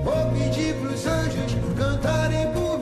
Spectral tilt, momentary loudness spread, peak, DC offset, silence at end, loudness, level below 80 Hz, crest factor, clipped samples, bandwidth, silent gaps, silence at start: -6 dB/octave; 3 LU; -12 dBFS; under 0.1%; 0 s; -24 LUFS; -34 dBFS; 10 dB; under 0.1%; 13 kHz; none; 0 s